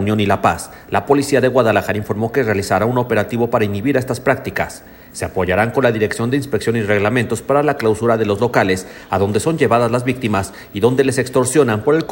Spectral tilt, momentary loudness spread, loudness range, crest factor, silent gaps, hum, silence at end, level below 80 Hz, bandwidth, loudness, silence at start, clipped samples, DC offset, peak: -5.5 dB/octave; 7 LU; 2 LU; 16 dB; none; none; 0 s; -46 dBFS; 17 kHz; -17 LUFS; 0 s; under 0.1%; under 0.1%; 0 dBFS